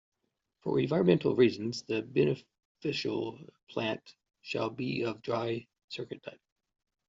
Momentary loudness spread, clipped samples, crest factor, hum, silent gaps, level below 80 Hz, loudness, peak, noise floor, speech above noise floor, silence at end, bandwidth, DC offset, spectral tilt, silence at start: 15 LU; under 0.1%; 22 dB; none; 2.65-2.75 s, 3.63-3.67 s, 5.84-5.88 s; -70 dBFS; -32 LUFS; -12 dBFS; -79 dBFS; 48 dB; 0.75 s; 7.6 kHz; under 0.1%; -5.5 dB/octave; 0.65 s